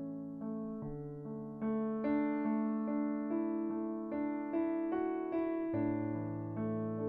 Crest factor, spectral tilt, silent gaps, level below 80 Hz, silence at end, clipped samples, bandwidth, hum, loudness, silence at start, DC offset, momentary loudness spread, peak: 12 dB; -11.5 dB/octave; none; -66 dBFS; 0 s; under 0.1%; 4.1 kHz; none; -37 LUFS; 0 s; under 0.1%; 9 LU; -24 dBFS